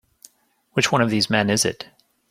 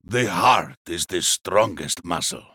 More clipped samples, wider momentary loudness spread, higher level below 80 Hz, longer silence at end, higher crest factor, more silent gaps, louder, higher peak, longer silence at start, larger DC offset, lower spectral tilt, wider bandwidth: neither; first, 15 LU vs 10 LU; about the same, -58 dBFS vs -56 dBFS; first, 0.45 s vs 0.15 s; about the same, 20 dB vs 16 dB; second, none vs 0.77-0.85 s; about the same, -20 LUFS vs -21 LUFS; first, -2 dBFS vs -6 dBFS; first, 0.75 s vs 0.1 s; neither; about the same, -3.5 dB/octave vs -2.5 dB/octave; second, 16 kHz vs 18.5 kHz